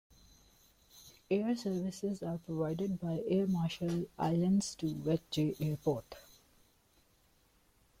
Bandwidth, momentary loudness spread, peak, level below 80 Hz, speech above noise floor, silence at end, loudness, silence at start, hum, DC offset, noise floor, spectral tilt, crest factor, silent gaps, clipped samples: 16 kHz; 9 LU; -20 dBFS; -64 dBFS; 36 dB; 1.8 s; -35 LUFS; 0.95 s; none; under 0.1%; -70 dBFS; -6.5 dB/octave; 16 dB; none; under 0.1%